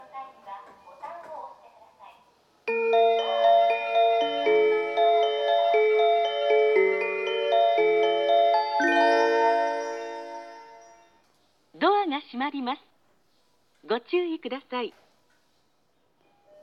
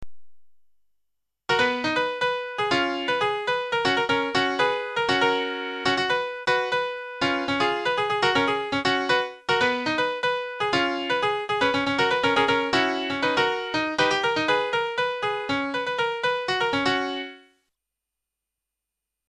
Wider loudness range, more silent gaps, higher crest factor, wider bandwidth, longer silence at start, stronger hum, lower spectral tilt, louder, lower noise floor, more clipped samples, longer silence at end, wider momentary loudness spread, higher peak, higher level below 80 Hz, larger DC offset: first, 10 LU vs 3 LU; neither; about the same, 16 dB vs 20 dB; second, 6.6 kHz vs 11 kHz; about the same, 0 s vs 0 s; neither; about the same, -3 dB/octave vs -3.5 dB/octave; about the same, -23 LUFS vs -24 LUFS; second, -70 dBFS vs -85 dBFS; neither; second, 1.7 s vs 1.9 s; first, 20 LU vs 5 LU; about the same, -8 dBFS vs -6 dBFS; second, -84 dBFS vs -58 dBFS; neither